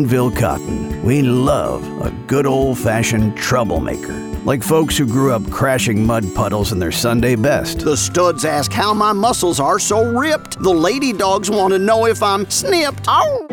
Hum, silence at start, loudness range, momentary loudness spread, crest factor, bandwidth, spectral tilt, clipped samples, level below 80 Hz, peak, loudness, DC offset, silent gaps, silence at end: none; 0 s; 2 LU; 5 LU; 12 dB; 19 kHz; -5 dB/octave; under 0.1%; -34 dBFS; -4 dBFS; -16 LUFS; under 0.1%; none; 0 s